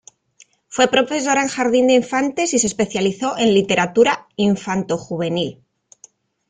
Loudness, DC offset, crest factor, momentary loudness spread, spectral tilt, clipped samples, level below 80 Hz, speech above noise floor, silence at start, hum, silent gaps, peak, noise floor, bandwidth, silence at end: -18 LUFS; under 0.1%; 16 dB; 8 LU; -4 dB/octave; under 0.1%; -56 dBFS; 36 dB; 0.7 s; none; none; -2 dBFS; -54 dBFS; 9.6 kHz; 0.95 s